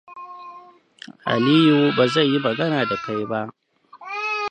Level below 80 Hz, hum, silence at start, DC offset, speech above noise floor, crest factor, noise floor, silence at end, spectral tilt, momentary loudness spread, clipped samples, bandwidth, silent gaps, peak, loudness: -66 dBFS; none; 0.1 s; under 0.1%; 27 dB; 18 dB; -46 dBFS; 0 s; -6.5 dB/octave; 23 LU; under 0.1%; 9.4 kHz; none; -4 dBFS; -20 LUFS